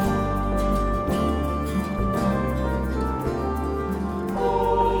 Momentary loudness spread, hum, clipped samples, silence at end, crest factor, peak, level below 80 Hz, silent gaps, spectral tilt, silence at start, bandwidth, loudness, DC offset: 5 LU; none; under 0.1%; 0 s; 14 dB; -8 dBFS; -30 dBFS; none; -7.5 dB/octave; 0 s; over 20 kHz; -25 LUFS; under 0.1%